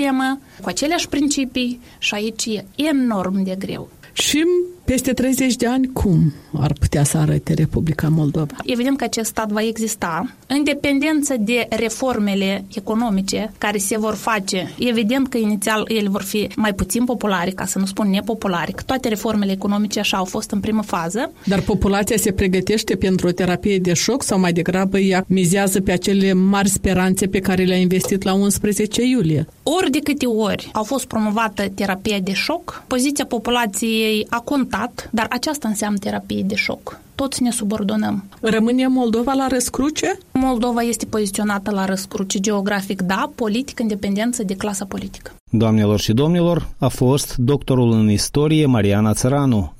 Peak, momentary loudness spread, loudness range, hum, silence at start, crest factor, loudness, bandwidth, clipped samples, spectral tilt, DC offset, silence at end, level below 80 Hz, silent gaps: -4 dBFS; 6 LU; 4 LU; none; 0 s; 14 dB; -19 LUFS; 16 kHz; under 0.1%; -5 dB/octave; under 0.1%; 0.05 s; -40 dBFS; 45.40-45.46 s